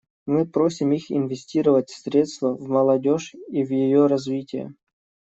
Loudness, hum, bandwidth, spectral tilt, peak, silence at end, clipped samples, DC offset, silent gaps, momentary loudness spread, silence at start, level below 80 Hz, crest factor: -22 LUFS; none; 8 kHz; -7 dB/octave; -6 dBFS; 0.65 s; under 0.1%; under 0.1%; none; 9 LU; 0.25 s; -68 dBFS; 16 dB